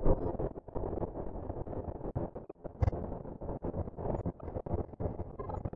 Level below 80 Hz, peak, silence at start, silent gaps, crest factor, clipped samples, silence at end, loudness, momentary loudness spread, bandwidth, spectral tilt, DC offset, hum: -42 dBFS; -14 dBFS; 0 s; none; 22 dB; under 0.1%; 0.05 s; -39 LUFS; 8 LU; 2.7 kHz; -11 dB/octave; under 0.1%; none